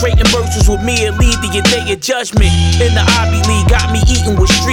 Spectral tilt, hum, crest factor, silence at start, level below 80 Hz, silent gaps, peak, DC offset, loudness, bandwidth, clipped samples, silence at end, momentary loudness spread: -4.5 dB/octave; none; 10 dB; 0 s; -16 dBFS; none; 0 dBFS; under 0.1%; -12 LUFS; 16.5 kHz; under 0.1%; 0 s; 3 LU